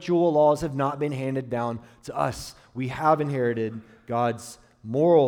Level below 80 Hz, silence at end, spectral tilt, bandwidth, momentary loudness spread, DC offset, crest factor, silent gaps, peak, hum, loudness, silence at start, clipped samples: -56 dBFS; 0 s; -7 dB/octave; 17 kHz; 17 LU; under 0.1%; 18 dB; none; -8 dBFS; none; -25 LUFS; 0 s; under 0.1%